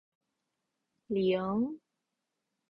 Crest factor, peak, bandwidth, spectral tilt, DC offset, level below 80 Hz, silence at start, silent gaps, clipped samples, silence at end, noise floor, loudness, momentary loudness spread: 16 dB; -20 dBFS; 5.4 kHz; -9.5 dB/octave; under 0.1%; -70 dBFS; 1.1 s; none; under 0.1%; 0.95 s; -86 dBFS; -32 LUFS; 8 LU